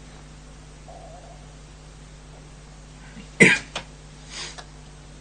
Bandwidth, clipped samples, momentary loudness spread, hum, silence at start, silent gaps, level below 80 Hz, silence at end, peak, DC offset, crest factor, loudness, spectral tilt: 11.5 kHz; under 0.1%; 29 LU; none; 0 s; none; -46 dBFS; 0 s; 0 dBFS; under 0.1%; 28 dB; -20 LUFS; -4 dB/octave